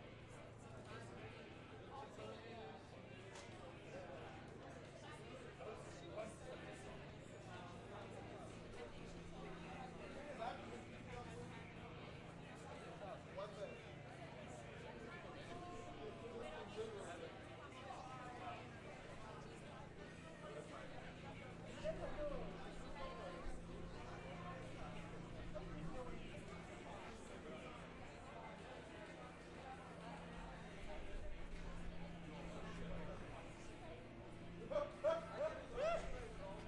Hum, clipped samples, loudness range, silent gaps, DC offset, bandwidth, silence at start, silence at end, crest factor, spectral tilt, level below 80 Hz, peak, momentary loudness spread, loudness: none; under 0.1%; 4 LU; none; under 0.1%; 11 kHz; 0 s; 0 s; 22 dB; -5.5 dB/octave; -60 dBFS; -30 dBFS; 8 LU; -52 LUFS